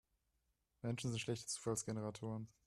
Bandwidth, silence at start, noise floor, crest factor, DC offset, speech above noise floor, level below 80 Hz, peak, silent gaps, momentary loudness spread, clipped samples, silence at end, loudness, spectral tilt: 13.5 kHz; 0.85 s; -84 dBFS; 18 dB; under 0.1%; 41 dB; -74 dBFS; -26 dBFS; none; 6 LU; under 0.1%; 0.15 s; -44 LUFS; -4.5 dB/octave